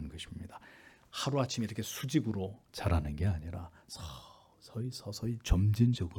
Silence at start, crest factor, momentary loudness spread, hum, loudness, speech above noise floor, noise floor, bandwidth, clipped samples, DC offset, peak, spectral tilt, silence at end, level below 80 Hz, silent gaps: 0 s; 20 dB; 17 LU; none; -35 LUFS; 25 dB; -58 dBFS; 18 kHz; under 0.1%; under 0.1%; -14 dBFS; -6 dB/octave; 0 s; -46 dBFS; none